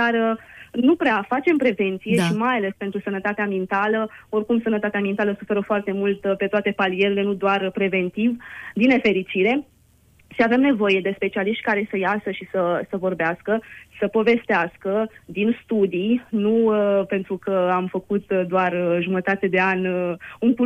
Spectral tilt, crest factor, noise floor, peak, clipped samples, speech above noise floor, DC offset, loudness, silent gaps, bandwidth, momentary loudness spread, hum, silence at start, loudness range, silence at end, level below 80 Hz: -7 dB/octave; 16 dB; -56 dBFS; -6 dBFS; under 0.1%; 35 dB; under 0.1%; -21 LUFS; none; 12.5 kHz; 7 LU; none; 0 s; 2 LU; 0 s; -60 dBFS